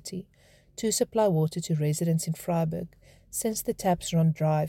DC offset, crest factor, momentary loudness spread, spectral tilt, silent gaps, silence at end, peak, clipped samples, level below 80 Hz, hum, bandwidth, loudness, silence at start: under 0.1%; 16 dB; 13 LU; -6 dB/octave; none; 0 s; -12 dBFS; under 0.1%; -58 dBFS; none; 17 kHz; -27 LUFS; 0.05 s